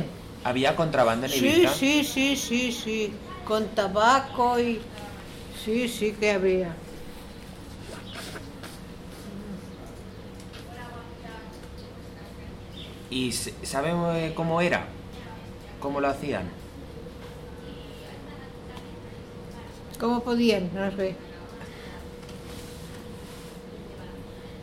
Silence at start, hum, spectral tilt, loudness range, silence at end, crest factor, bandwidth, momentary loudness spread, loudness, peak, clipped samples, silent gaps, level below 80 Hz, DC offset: 0 s; none; -4.5 dB/octave; 17 LU; 0 s; 22 dB; 16.5 kHz; 20 LU; -26 LUFS; -8 dBFS; under 0.1%; none; -48 dBFS; under 0.1%